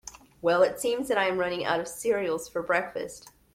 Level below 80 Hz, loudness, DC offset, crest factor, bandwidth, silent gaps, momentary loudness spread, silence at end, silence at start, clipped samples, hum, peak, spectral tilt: -62 dBFS; -27 LUFS; under 0.1%; 18 dB; 16 kHz; none; 13 LU; 0.25 s; 0.05 s; under 0.1%; none; -10 dBFS; -3.5 dB/octave